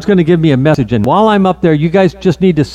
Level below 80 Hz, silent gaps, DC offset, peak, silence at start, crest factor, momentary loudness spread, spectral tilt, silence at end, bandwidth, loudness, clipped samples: -36 dBFS; none; under 0.1%; 0 dBFS; 0 s; 10 dB; 3 LU; -8 dB/octave; 0 s; 10 kHz; -10 LUFS; under 0.1%